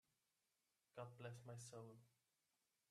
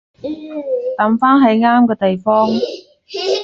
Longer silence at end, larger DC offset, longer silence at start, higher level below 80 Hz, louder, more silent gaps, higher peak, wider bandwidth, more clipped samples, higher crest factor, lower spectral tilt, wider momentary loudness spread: first, 0.8 s vs 0 s; neither; first, 0.95 s vs 0.25 s; second, under -90 dBFS vs -58 dBFS; second, -59 LUFS vs -14 LUFS; neither; second, -42 dBFS vs -2 dBFS; first, 13 kHz vs 7.2 kHz; neither; first, 20 dB vs 14 dB; about the same, -5 dB/octave vs -6 dB/octave; second, 7 LU vs 16 LU